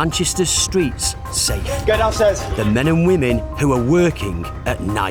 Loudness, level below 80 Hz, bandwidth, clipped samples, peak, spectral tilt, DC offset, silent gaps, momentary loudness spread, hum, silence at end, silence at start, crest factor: -17 LUFS; -30 dBFS; over 20 kHz; under 0.1%; -4 dBFS; -4.5 dB/octave; under 0.1%; none; 7 LU; none; 0 s; 0 s; 14 dB